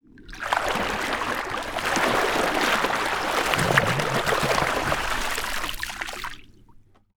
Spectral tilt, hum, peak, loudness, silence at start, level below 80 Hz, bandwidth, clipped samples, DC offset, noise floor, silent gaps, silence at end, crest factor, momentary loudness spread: -3 dB/octave; none; -2 dBFS; -24 LUFS; 0.2 s; -42 dBFS; over 20 kHz; under 0.1%; under 0.1%; -52 dBFS; none; 0.45 s; 24 dB; 10 LU